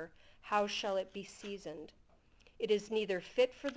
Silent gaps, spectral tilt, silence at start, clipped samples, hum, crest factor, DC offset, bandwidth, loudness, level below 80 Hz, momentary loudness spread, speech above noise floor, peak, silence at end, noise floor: none; -4 dB/octave; 0 s; under 0.1%; none; 20 dB; under 0.1%; 8 kHz; -37 LUFS; -70 dBFS; 17 LU; 29 dB; -18 dBFS; 0 s; -65 dBFS